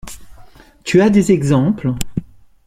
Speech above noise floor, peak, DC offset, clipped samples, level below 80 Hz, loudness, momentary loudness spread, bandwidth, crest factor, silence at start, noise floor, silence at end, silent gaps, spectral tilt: 28 dB; -2 dBFS; under 0.1%; under 0.1%; -38 dBFS; -15 LUFS; 16 LU; 16 kHz; 16 dB; 0.05 s; -41 dBFS; 0.4 s; none; -6.5 dB/octave